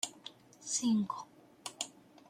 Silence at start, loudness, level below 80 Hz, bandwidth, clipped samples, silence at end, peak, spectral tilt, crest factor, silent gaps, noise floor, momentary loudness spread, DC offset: 0.05 s; -36 LUFS; -82 dBFS; 16 kHz; under 0.1%; 0.4 s; -18 dBFS; -3 dB/octave; 20 dB; none; -55 dBFS; 20 LU; under 0.1%